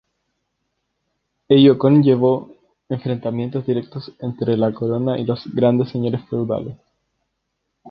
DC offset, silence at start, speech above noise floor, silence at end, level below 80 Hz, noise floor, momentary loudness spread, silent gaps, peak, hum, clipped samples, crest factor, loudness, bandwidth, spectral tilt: under 0.1%; 1.5 s; 57 dB; 0 s; -58 dBFS; -75 dBFS; 14 LU; none; 0 dBFS; none; under 0.1%; 18 dB; -18 LUFS; 5.6 kHz; -10.5 dB/octave